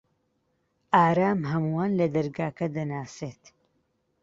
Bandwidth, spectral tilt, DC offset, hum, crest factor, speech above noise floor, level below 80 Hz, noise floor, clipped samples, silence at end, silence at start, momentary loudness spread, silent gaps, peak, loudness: 7.8 kHz; -7.5 dB/octave; under 0.1%; none; 22 dB; 48 dB; -64 dBFS; -73 dBFS; under 0.1%; 0.9 s; 0.9 s; 15 LU; none; -6 dBFS; -26 LUFS